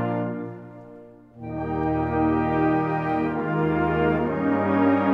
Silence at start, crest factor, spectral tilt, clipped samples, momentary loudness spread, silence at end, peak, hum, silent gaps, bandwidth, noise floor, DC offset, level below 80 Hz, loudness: 0 s; 14 dB; -10 dB/octave; under 0.1%; 15 LU; 0 s; -8 dBFS; none; none; 5.2 kHz; -46 dBFS; under 0.1%; -44 dBFS; -23 LUFS